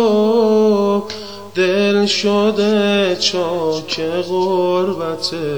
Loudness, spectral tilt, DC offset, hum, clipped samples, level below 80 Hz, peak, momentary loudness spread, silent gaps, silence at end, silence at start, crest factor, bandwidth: -16 LUFS; -4.5 dB/octave; 0.8%; none; under 0.1%; -60 dBFS; -2 dBFS; 7 LU; none; 0 s; 0 s; 12 dB; over 20 kHz